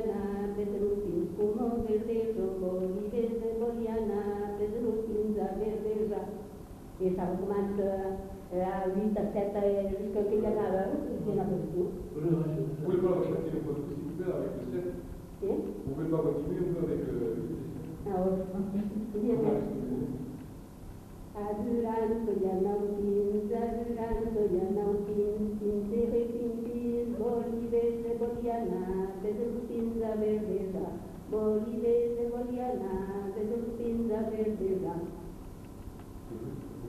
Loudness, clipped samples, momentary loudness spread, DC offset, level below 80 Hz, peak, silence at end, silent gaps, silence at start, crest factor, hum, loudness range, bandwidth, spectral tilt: -32 LUFS; under 0.1%; 10 LU; under 0.1%; -50 dBFS; -16 dBFS; 0 s; none; 0 s; 16 dB; none; 3 LU; 14 kHz; -9 dB/octave